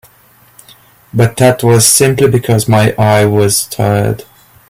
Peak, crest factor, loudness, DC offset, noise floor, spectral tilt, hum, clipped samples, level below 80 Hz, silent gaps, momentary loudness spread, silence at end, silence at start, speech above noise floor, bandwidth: 0 dBFS; 12 dB; -10 LUFS; under 0.1%; -46 dBFS; -4.5 dB/octave; none; under 0.1%; -42 dBFS; none; 7 LU; 0.45 s; 1.15 s; 36 dB; 16.5 kHz